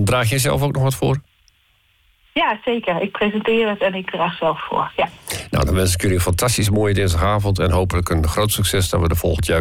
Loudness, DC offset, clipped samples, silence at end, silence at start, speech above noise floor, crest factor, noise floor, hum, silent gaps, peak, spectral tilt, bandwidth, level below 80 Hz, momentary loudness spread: -19 LUFS; under 0.1%; under 0.1%; 0 s; 0 s; 41 dB; 10 dB; -59 dBFS; none; none; -8 dBFS; -5 dB/octave; 17 kHz; -34 dBFS; 5 LU